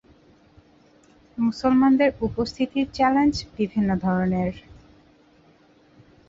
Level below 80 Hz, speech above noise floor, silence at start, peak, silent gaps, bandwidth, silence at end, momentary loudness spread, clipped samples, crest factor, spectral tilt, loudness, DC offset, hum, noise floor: -48 dBFS; 35 dB; 1.35 s; -8 dBFS; none; 7.8 kHz; 1.7 s; 9 LU; under 0.1%; 18 dB; -7 dB/octave; -22 LUFS; under 0.1%; none; -56 dBFS